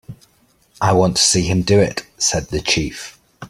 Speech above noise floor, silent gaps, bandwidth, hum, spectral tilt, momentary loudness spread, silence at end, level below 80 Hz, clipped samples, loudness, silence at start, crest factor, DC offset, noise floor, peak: 41 dB; none; 15 kHz; none; -3.5 dB/octave; 11 LU; 0.05 s; -40 dBFS; under 0.1%; -16 LUFS; 0.1 s; 16 dB; under 0.1%; -57 dBFS; -2 dBFS